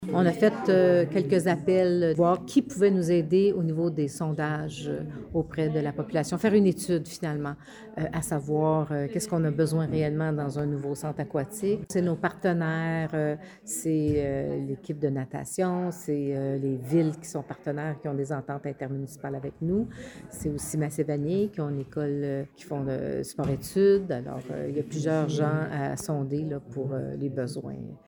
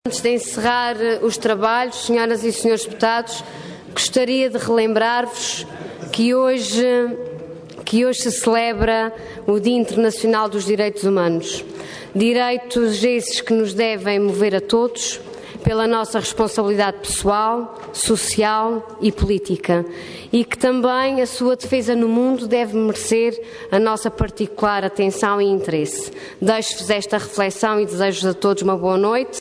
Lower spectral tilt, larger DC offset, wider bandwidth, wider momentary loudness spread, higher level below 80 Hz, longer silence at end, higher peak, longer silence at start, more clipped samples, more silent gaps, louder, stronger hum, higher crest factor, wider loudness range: first, -7 dB/octave vs -4 dB/octave; neither; first, over 20 kHz vs 11 kHz; first, 11 LU vs 8 LU; second, -56 dBFS vs -42 dBFS; about the same, 0.1 s vs 0 s; second, -10 dBFS vs -4 dBFS; about the same, 0 s vs 0.05 s; neither; neither; second, -28 LUFS vs -19 LUFS; neither; about the same, 18 dB vs 14 dB; first, 6 LU vs 1 LU